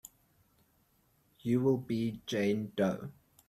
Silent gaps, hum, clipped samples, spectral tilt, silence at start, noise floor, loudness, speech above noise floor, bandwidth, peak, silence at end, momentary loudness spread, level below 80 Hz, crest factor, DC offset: none; none; under 0.1%; -7 dB/octave; 1.45 s; -71 dBFS; -33 LUFS; 39 dB; 14.5 kHz; -18 dBFS; 0.4 s; 12 LU; -68 dBFS; 18 dB; under 0.1%